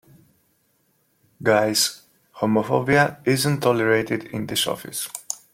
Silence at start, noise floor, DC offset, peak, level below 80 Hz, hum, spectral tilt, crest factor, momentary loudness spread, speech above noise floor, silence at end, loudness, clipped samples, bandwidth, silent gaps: 1.4 s; -66 dBFS; under 0.1%; -2 dBFS; -60 dBFS; none; -4 dB/octave; 20 dB; 10 LU; 45 dB; 0.15 s; -21 LUFS; under 0.1%; 16.5 kHz; none